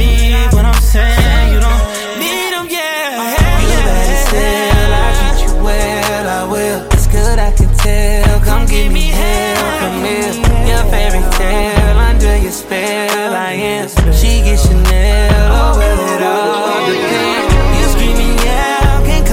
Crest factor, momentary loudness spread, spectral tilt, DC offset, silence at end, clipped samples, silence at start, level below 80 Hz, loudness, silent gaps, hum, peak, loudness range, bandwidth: 10 dB; 5 LU; -4.5 dB/octave; under 0.1%; 0 s; under 0.1%; 0 s; -12 dBFS; -13 LUFS; none; none; 0 dBFS; 2 LU; 16.5 kHz